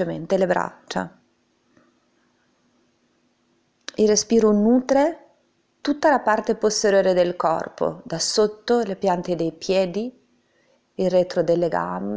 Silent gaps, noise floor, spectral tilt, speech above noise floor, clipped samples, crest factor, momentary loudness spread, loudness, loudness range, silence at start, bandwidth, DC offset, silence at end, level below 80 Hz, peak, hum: none; -65 dBFS; -4.5 dB/octave; 45 dB; under 0.1%; 16 dB; 12 LU; -21 LUFS; 9 LU; 0 s; 8 kHz; under 0.1%; 0 s; -58 dBFS; -6 dBFS; none